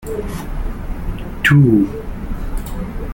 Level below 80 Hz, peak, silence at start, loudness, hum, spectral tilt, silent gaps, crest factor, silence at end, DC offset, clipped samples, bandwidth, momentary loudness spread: -26 dBFS; -2 dBFS; 0 s; -18 LUFS; none; -7 dB/octave; none; 16 dB; 0 s; under 0.1%; under 0.1%; 17 kHz; 17 LU